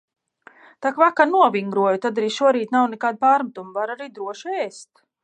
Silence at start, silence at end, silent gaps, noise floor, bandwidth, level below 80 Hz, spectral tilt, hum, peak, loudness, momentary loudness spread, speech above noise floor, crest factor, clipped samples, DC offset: 0.8 s; 0.4 s; none; -51 dBFS; 9.4 kHz; -80 dBFS; -5 dB/octave; none; -2 dBFS; -20 LUFS; 13 LU; 31 dB; 20 dB; under 0.1%; under 0.1%